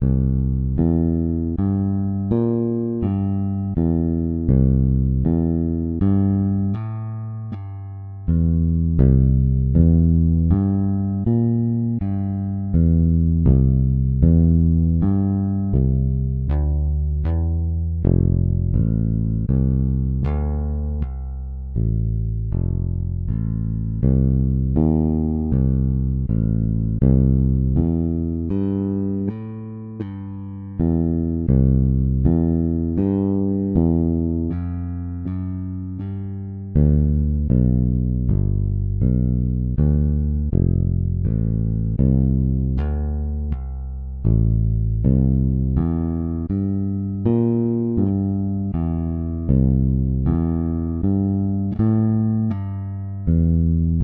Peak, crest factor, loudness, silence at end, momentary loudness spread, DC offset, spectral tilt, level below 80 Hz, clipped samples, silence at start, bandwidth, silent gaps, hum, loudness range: -4 dBFS; 16 dB; -20 LUFS; 0 s; 10 LU; under 0.1%; -14.5 dB/octave; -26 dBFS; under 0.1%; 0 s; 2.5 kHz; none; none; 5 LU